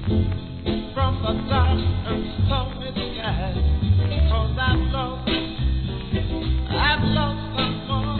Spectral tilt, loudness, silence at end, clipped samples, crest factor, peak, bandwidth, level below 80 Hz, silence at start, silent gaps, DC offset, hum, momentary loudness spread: -9.5 dB/octave; -23 LUFS; 0 s; under 0.1%; 14 dB; -6 dBFS; 4.5 kHz; -26 dBFS; 0 s; none; 0.3%; none; 7 LU